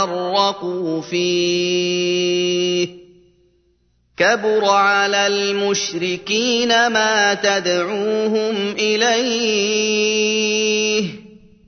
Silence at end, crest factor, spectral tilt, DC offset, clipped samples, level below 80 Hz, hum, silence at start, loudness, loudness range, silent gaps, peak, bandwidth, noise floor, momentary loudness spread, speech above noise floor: 0.4 s; 16 dB; -2.5 dB/octave; under 0.1%; under 0.1%; -62 dBFS; none; 0 s; -17 LUFS; 4 LU; none; -2 dBFS; 6.6 kHz; -61 dBFS; 6 LU; 43 dB